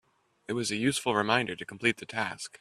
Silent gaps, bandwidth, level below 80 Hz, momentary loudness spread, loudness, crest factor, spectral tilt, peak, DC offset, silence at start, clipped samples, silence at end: none; 14 kHz; -68 dBFS; 9 LU; -29 LUFS; 22 dB; -3.5 dB/octave; -8 dBFS; under 0.1%; 0.5 s; under 0.1%; 0.05 s